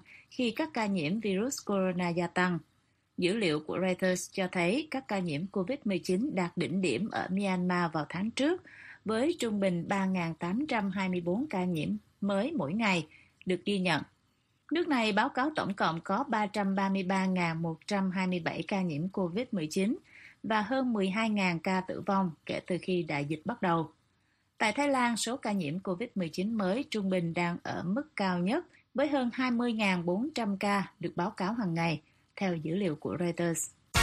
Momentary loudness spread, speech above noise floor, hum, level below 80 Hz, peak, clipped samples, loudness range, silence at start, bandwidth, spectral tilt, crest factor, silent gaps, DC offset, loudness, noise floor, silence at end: 6 LU; 42 dB; none; -66 dBFS; -14 dBFS; under 0.1%; 2 LU; 0.1 s; 14 kHz; -5.5 dB/octave; 18 dB; none; under 0.1%; -32 LUFS; -73 dBFS; 0 s